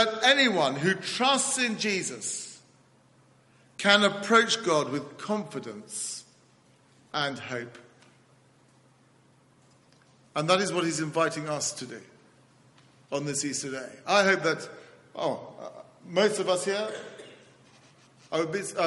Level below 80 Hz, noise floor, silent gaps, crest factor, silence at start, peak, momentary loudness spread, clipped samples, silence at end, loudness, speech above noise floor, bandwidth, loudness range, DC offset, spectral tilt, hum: -74 dBFS; -61 dBFS; none; 26 dB; 0 s; -4 dBFS; 19 LU; under 0.1%; 0 s; -27 LUFS; 34 dB; 11.5 kHz; 11 LU; under 0.1%; -3 dB/octave; none